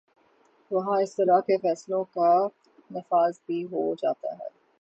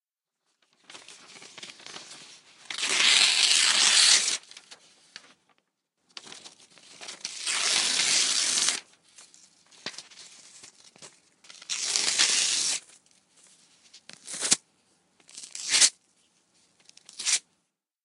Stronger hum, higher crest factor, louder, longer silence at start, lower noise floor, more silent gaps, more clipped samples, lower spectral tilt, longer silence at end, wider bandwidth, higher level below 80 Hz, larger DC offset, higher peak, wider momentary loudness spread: neither; second, 18 dB vs 28 dB; second, -26 LUFS vs -22 LUFS; second, 0.7 s vs 0.95 s; second, -63 dBFS vs -82 dBFS; neither; neither; first, -6.5 dB/octave vs 3 dB/octave; second, 0.35 s vs 0.65 s; second, 8.2 kHz vs 16 kHz; first, -78 dBFS vs -84 dBFS; neither; second, -8 dBFS vs -2 dBFS; second, 14 LU vs 26 LU